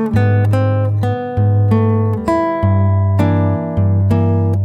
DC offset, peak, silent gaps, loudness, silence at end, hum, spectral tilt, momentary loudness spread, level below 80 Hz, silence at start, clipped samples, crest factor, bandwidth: under 0.1%; -2 dBFS; none; -15 LUFS; 0 s; none; -9.5 dB/octave; 3 LU; -40 dBFS; 0 s; under 0.1%; 10 dB; 5.2 kHz